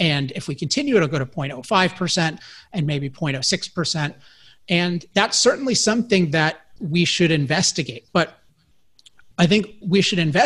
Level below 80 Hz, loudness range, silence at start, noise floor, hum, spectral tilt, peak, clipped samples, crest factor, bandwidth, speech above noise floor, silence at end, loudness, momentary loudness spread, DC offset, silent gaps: -54 dBFS; 4 LU; 0 s; -60 dBFS; none; -4 dB/octave; -2 dBFS; under 0.1%; 20 dB; 11.5 kHz; 40 dB; 0 s; -20 LUFS; 10 LU; 0.2%; none